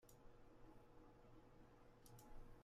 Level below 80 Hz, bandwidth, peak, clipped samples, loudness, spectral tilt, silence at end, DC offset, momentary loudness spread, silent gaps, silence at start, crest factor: -68 dBFS; 14.5 kHz; -48 dBFS; under 0.1%; -68 LUFS; -5.5 dB/octave; 0 s; under 0.1%; 4 LU; none; 0 s; 16 dB